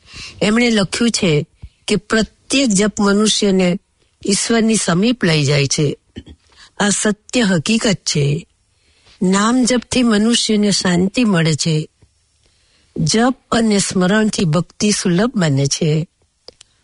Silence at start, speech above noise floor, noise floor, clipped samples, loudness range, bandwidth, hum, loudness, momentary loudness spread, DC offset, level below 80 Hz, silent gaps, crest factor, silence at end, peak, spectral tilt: 0.1 s; 43 dB; -58 dBFS; under 0.1%; 2 LU; 11 kHz; none; -15 LUFS; 7 LU; under 0.1%; -46 dBFS; none; 14 dB; 0.8 s; -2 dBFS; -4.5 dB/octave